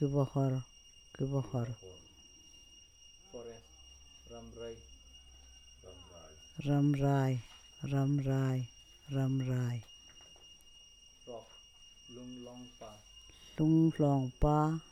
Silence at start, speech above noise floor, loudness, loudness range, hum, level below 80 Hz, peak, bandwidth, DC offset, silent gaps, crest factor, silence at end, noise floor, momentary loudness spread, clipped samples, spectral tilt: 0 s; 27 dB; -33 LUFS; 18 LU; none; -52 dBFS; -16 dBFS; 9 kHz; under 0.1%; none; 20 dB; 0.1 s; -59 dBFS; 26 LU; under 0.1%; -8 dB/octave